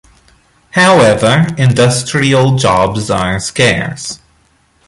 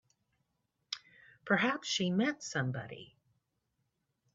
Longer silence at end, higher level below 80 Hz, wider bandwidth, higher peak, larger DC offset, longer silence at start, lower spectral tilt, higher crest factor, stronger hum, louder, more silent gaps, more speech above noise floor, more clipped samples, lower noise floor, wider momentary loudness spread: second, 0.7 s vs 1.3 s; first, -38 dBFS vs -78 dBFS; first, 11.5 kHz vs 7.8 kHz; first, 0 dBFS vs -14 dBFS; neither; second, 0.75 s vs 0.9 s; first, -5 dB/octave vs -3.5 dB/octave; second, 12 dB vs 24 dB; neither; first, -11 LUFS vs -34 LUFS; neither; second, 42 dB vs 49 dB; neither; second, -53 dBFS vs -82 dBFS; second, 11 LU vs 17 LU